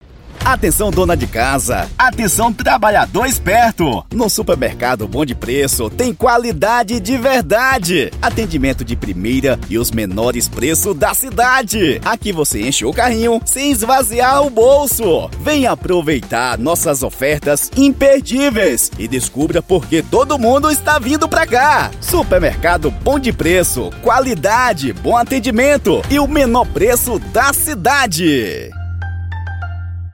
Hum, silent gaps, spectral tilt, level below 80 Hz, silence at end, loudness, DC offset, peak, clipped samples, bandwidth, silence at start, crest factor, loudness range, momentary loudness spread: none; none; -4 dB/octave; -28 dBFS; 0 s; -14 LUFS; under 0.1%; 0 dBFS; under 0.1%; 17 kHz; 0.1 s; 14 dB; 2 LU; 6 LU